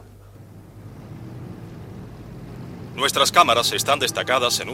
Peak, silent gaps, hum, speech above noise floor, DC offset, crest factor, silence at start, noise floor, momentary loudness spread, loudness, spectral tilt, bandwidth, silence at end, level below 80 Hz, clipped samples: -2 dBFS; none; none; 25 dB; under 0.1%; 22 dB; 0 s; -44 dBFS; 23 LU; -18 LUFS; -2 dB/octave; 16.5 kHz; 0 s; -52 dBFS; under 0.1%